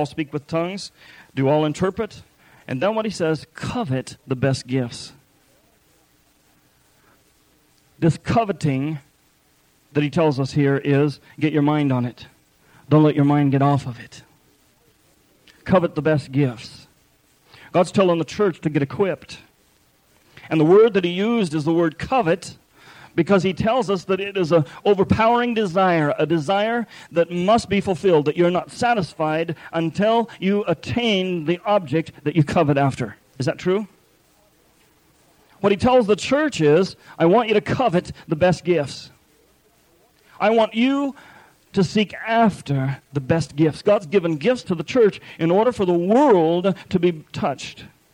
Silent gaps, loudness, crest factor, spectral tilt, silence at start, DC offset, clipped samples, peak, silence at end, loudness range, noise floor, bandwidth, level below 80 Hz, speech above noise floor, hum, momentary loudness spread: none; -20 LUFS; 18 dB; -6.5 dB/octave; 0 s; under 0.1%; under 0.1%; -4 dBFS; 0.25 s; 6 LU; -60 dBFS; 15.5 kHz; -52 dBFS; 40 dB; none; 10 LU